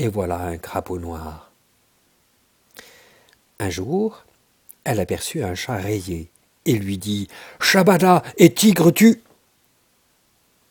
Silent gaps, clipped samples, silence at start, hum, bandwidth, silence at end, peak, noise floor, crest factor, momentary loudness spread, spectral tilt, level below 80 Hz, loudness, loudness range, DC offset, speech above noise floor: none; under 0.1%; 0 s; none; 19.5 kHz; 1.5 s; 0 dBFS; -62 dBFS; 20 dB; 17 LU; -5 dB/octave; -50 dBFS; -19 LUFS; 15 LU; under 0.1%; 44 dB